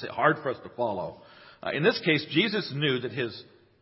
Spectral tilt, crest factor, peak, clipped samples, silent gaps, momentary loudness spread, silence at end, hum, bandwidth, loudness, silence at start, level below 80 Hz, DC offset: -9 dB/octave; 22 dB; -6 dBFS; under 0.1%; none; 11 LU; 0.4 s; none; 5.8 kHz; -27 LUFS; 0 s; -66 dBFS; under 0.1%